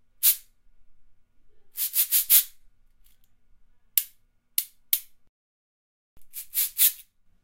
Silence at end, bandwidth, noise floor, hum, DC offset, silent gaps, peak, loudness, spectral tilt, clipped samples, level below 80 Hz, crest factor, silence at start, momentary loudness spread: 0.4 s; 16.5 kHz; -60 dBFS; none; under 0.1%; 5.29-6.17 s; -2 dBFS; -22 LUFS; 5 dB/octave; under 0.1%; -64 dBFS; 28 dB; 0.2 s; 22 LU